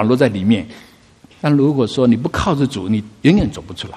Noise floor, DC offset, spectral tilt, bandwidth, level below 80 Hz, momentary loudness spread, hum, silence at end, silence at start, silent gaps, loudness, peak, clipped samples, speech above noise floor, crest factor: -47 dBFS; under 0.1%; -7 dB/octave; 12.5 kHz; -38 dBFS; 8 LU; none; 0 s; 0 s; none; -16 LUFS; 0 dBFS; under 0.1%; 31 dB; 16 dB